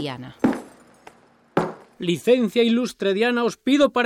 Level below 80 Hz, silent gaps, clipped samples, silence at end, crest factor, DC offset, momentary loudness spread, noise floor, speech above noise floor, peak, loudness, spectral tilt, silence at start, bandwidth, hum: -60 dBFS; none; under 0.1%; 0 s; 16 dB; under 0.1%; 11 LU; -50 dBFS; 30 dB; -6 dBFS; -22 LUFS; -5.5 dB/octave; 0 s; 15 kHz; none